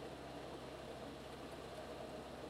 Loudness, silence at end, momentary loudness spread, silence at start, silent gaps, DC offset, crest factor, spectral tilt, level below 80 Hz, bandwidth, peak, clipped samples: -51 LUFS; 0 s; 1 LU; 0 s; none; under 0.1%; 14 dB; -5 dB/octave; -64 dBFS; 16 kHz; -38 dBFS; under 0.1%